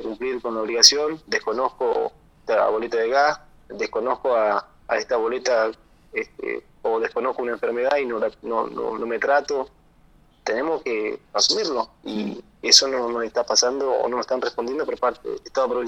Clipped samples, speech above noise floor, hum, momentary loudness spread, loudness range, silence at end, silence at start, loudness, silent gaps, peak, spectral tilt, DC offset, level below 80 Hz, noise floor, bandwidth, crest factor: under 0.1%; 32 dB; none; 13 LU; 5 LU; 0 s; 0 s; -22 LUFS; none; 0 dBFS; -1 dB/octave; under 0.1%; -58 dBFS; -55 dBFS; 18 kHz; 24 dB